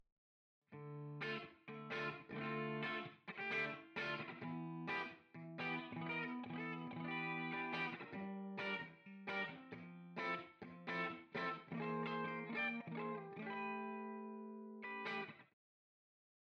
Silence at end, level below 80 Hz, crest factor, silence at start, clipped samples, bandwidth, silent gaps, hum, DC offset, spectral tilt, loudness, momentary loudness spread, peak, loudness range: 1.1 s; -86 dBFS; 16 dB; 0.7 s; under 0.1%; 8.4 kHz; none; none; under 0.1%; -6.5 dB/octave; -46 LUFS; 10 LU; -30 dBFS; 2 LU